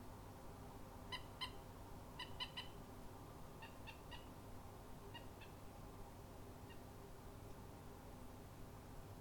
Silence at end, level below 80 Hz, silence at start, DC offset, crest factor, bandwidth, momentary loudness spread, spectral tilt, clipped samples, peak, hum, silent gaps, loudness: 0 s; -62 dBFS; 0 s; under 0.1%; 22 dB; 19 kHz; 8 LU; -4.5 dB/octave; under 0.1%; -34 dBFS; none; none; -55 LUFS